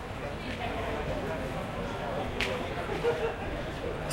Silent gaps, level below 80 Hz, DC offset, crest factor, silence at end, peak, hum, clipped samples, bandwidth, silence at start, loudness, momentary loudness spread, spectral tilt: none; -44 dBFS; under 0.1%; 22 dB; 0 s; -12 dBFS; none; under 0.1%; 16.5 kHz; 0 s; -33 LUFS; 5 LU; -5.5 dB/octave